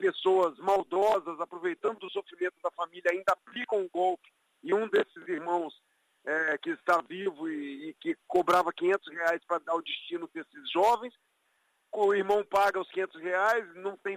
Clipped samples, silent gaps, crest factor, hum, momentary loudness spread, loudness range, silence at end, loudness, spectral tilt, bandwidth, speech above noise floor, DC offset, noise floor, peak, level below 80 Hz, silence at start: under 0.1%; none; 18 dB; none; 12 LU; 3 LU; 0 s; -30 LUFS; -4 dB/octave; 15.5 kHz; 44 dB; under 0.1%; -73 dBFS; -14 dBFS; -74 dBFS; 0 s